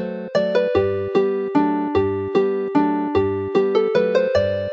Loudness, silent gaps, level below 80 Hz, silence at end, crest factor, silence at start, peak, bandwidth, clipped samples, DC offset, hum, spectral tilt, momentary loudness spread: -20 LUFS; none; -50 dBFS; 0 s; 14 dB; 0 s; -4 dBFS; 7.2 kHz; under 0.1%; under 0.1%; none; -7.5 dB/octave; 2 LU